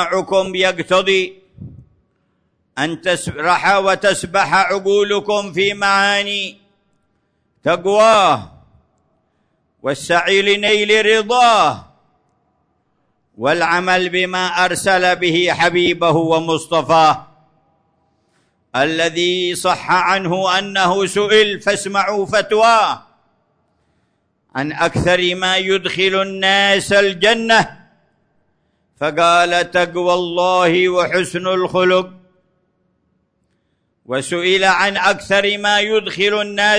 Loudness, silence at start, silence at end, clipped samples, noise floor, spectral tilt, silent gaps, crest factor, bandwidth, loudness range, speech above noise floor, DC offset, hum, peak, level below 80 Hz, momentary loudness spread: -15 LUFS; 0 s; 0 s; under 0.1%; -66 dBFS; -3.5 dB/octave; none; 16 dB; 11 kHz; 4 LU; 51 dB; under 0.1%; none; -2 dBFS; -52 dBFS; 8 LU